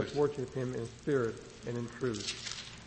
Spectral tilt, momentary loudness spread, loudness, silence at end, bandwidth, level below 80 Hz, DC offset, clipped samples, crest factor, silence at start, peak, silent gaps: -5 dB/octave; 8 LU; -36 LUFS; 0 s; 8.4 kHz; -60 dBFS; under 0.1%; under 0.1%; 18 dB; 0 s; -18 dBFS; none